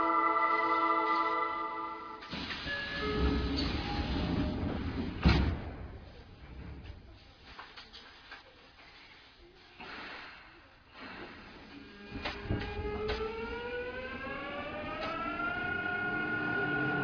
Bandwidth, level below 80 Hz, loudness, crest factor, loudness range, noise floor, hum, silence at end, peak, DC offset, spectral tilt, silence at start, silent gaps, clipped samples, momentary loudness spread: 5.4 kHz; -44 dBFS; -34 LUFS; 22 dB; 17 LU; -57 dBFS; none; 0 s; -12 dBFS; under 0.1%; -7 dB/octave; 0 s; none; under 0.1%; 22 LU